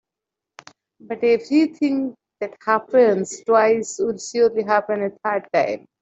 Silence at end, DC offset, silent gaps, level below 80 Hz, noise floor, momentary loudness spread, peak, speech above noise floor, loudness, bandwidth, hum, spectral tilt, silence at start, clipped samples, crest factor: 0.25 s; under 0.1%; none; -68 dBFS; -86 dBFS; 9 LU; -4 dBFS; 66 dB; -20 LUFS; 8.2 kHz; none; -4.5 dB/octave; 1.05 s; under 0.1%; 18 dB